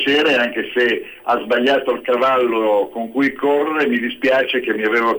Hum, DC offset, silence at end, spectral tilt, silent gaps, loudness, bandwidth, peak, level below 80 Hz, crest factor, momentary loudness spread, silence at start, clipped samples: none; under 0.1%; 0 s; -4.5 dB/octave; none; -17 LUFS; over 20 kHz; -6 dBFS; -58 dBFS; 10 dB; 4 LU; 0 s; under 0.1%